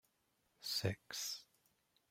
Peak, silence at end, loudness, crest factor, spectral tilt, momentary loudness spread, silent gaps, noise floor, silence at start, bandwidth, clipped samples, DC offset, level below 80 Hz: -22 dBFS; 0.65 s; -43 LUFS; 24 dB; -3 dB/octave; 10 LU; none; -81 dBFS; 0.6 s; 16 kHz; under 0.1%; under 0.1%; -78 dBFS